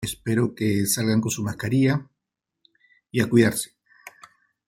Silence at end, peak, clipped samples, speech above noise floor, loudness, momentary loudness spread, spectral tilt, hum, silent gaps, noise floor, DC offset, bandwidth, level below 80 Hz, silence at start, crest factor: 0.6 s; -4 dBFS; under 0.1%; 62 dB; -23 LUFS; 10 LU; -5 dB/octave; none; none; -84 dBFS; under 0.1%; 16.5 kHz; -58 dBFS; 0 s; 20 dB